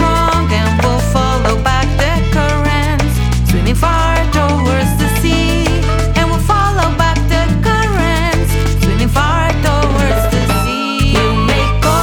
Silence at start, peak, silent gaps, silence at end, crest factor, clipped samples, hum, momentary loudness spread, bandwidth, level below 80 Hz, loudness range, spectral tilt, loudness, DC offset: 0 s; -2 dBFS; none; 0 s; 10 dB; under 0.1%; none; 2 LU; 18 kHz; -16 dBFS; 0 LU; -5.5 dB/octave; -13 LUFS; under 0.1%